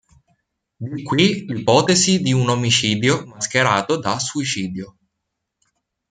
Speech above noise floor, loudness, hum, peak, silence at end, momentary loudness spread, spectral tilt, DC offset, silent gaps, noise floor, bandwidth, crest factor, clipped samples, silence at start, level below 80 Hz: 60 dB; -18 LUFS; none; -2 dBFS; 1.2 s; 14 LU; -4 dB/octave; under 0.1%; none; -78 dBFS; 9.6 kHz; 18 dB; under 0.1%; 0.8 s; -56 dBFS